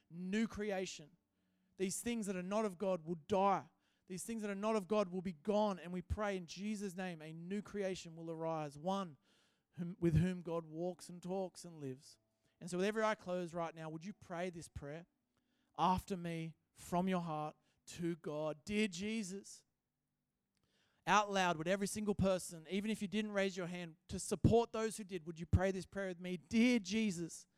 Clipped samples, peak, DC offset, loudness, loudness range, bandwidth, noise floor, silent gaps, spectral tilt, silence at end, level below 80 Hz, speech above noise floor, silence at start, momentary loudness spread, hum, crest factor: under 0.1%; -18 dBFS; under 0.1%; -40 LUFS; 6 LU; 15 kHz; -89 dBFS; none; -5.5 dB/octave; 0.15 s; -58 dBFS; 50 dB; 0.1 s; 14 LU; none; 22 dB